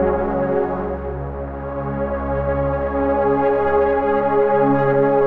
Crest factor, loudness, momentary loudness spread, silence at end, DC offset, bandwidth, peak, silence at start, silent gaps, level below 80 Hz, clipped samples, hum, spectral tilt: 12 dB; -19 LUFS; 10 LU; 0 s; 0.6%; 4.4 kHz; -6 dBFS; 0 s; none; -34 dBFS; under 0.1%; none; -10.5 dB/octave